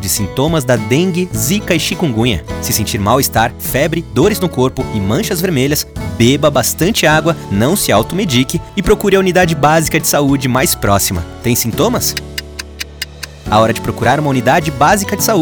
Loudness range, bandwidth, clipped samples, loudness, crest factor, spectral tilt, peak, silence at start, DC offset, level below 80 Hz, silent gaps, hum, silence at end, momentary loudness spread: 3 LU; over 20 kHz; under 0.1%; -13 LUFS; 12 dB; -4.5 dB/octave; 0 dBFS; 0 s; under 0.1%; -32 dBFS; none; none; 0 s; 7 LU